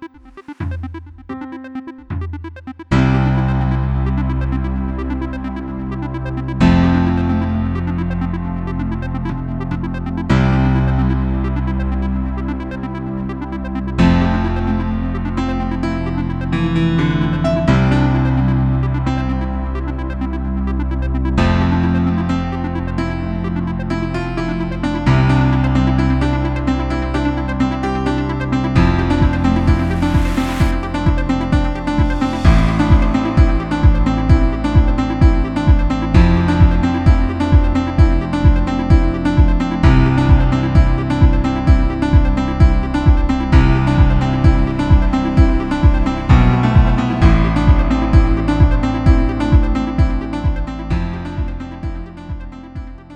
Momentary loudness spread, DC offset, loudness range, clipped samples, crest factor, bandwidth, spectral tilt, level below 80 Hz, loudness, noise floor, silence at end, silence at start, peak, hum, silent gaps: 11 LU; under 0.1%; 5 LU; under 0.1%; 14 dB; 9 kHz; -8 dB/octave; -18 dBFS; -16 LUFS; -36 dBFS; 0 s; 0 s; 0 dBFS; none; none